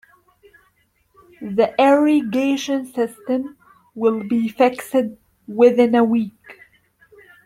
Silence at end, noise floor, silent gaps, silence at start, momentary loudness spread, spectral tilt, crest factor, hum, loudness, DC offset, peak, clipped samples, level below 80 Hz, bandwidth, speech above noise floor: 0.95 s; -63 dBFS; none; 1.4 s; 11 LU; -5.5 dB/octave; 18 dB; none; -18 LUFS; under 0.1%; -2 dBFS; under 0.1%; -64 dBFS; 15.5 kHz; 45 dB